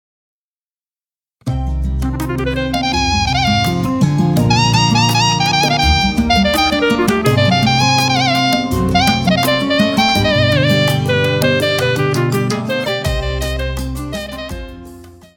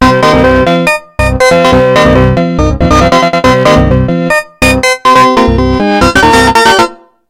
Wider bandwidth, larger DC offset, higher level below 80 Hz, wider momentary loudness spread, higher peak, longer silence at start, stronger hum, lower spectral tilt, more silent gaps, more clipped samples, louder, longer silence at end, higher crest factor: about the same, 18 kHz vs 16.5 kHz; second, under 0.1% vs 0.2%; second, -28 dBFS vs -20 dBFS; first, 9 LU vs 5 LU; about the same, -2 dBFS vs 0 dBFS; first, 1.45 s vs 0 s; neither; about the same, -5 dB/octave vs -5 dB/octave; neither; second, under 0.1% vs 4%; second, -14 LUFS vs -7 LUFS; about the same, 0.25 s vs 0.35 s; first, 14 dB vs 6 dB